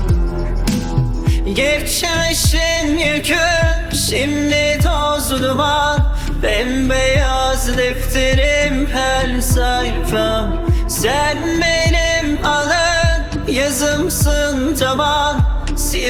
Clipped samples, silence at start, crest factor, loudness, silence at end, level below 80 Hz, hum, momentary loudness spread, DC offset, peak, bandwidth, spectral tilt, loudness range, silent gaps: under 0.1%; 0 s; 14 dB; -16 LUFS; 0 s; -20 dBFS; none; 4 LU; under 0.1%; -2 dBFS; 18.5 kHz; -4 dB/octave; 1 LU; none